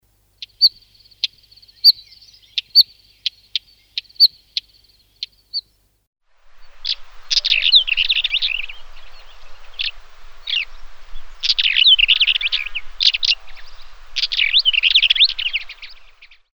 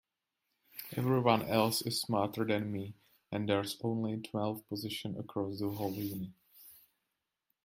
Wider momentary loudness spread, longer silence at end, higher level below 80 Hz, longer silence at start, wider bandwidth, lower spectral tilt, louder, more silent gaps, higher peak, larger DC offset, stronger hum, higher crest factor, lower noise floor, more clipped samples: about the same, 17 LU vs 15 LU; second, 0.3 s vs 0.9 s; first, -42 dBFS vs -72 dBFS; second, 0.4 s vs 0.75 s; first, over 20 kHz vs 16.5 kHz; second, 3 dB/octave vs -5.5 dB/octave; first, -15 LUFS vs -35 LUFS; first, 6.07-6.13 s vs none; first, 0 dBFS vs -10 dBFS; neither; neither; about the same, 20 dB vs 24 dB; second, -54 dBFS vs -86 dBFS; neither